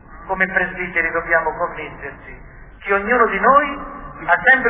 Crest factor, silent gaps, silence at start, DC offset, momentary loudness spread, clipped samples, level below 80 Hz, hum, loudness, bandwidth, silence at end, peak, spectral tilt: 18 dB; none; 0.1 s; under 0.1%; 18 LU; under 0.1%; -42 dBFS; none; -17 LUFS; 3.8 kHz; 0 s; -2 dBFS; -8 dB/octave